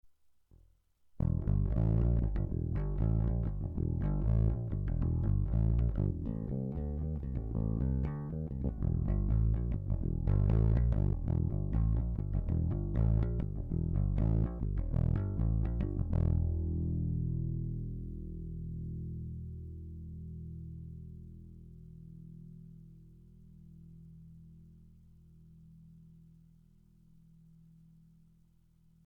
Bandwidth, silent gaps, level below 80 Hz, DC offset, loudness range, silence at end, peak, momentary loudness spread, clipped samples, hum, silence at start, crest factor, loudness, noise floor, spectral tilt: 2.8 kHz; none; -38 dBFS; under 0.1%; 17 LU; 3.2 s; -22 dBFS; 20 LU; under 0.1%; none; 0.05 s; 12 dB; -34 LUFS; -67 dBFS; -12 dB/octave